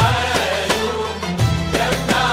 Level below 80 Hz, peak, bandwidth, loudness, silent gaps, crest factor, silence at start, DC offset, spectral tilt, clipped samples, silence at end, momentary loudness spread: -34 dBFS; -2 dBFS; 16 kHz; -19 LUFS; none; 16 dB; 0 s; under 0.1%; -4.5 dB/octave; under 0.1%; 0 s; 5 LU